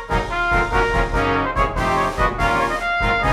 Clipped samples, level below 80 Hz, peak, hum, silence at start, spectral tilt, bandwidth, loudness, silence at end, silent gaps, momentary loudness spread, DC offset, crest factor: under 0.1%; -28 dBFS; -4 dBFS; none; 0 s; -5.5 dB/octave; 14 kHz; -19 LUFS; 0 s; none; 2 LU; under 0.1%; 14 dB